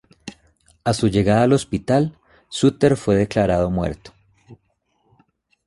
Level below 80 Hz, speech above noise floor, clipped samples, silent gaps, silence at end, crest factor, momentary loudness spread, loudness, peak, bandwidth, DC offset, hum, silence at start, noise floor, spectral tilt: -42 dBFS; 50 dB; under 0.1%; none; 1.15 s; 18 dB; 17 LU; -19 LUFS; -2 dBFS; 11.5 kHz; under 0.1%; none; 0.25 s; -67 dBFS; -6.5 dB/octave